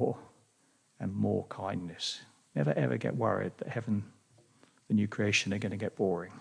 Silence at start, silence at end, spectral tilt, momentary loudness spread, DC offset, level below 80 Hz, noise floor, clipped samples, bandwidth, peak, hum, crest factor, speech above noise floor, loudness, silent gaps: 0 s; 0 s; -5.5 dB/octave; 10 LU; under 0.1%; -74 dBFS; -70 dBFS; under 0.1%; 10.5 kHz; -16 dBFS; none; 18 dB; 37 dB; -33 LUFS; none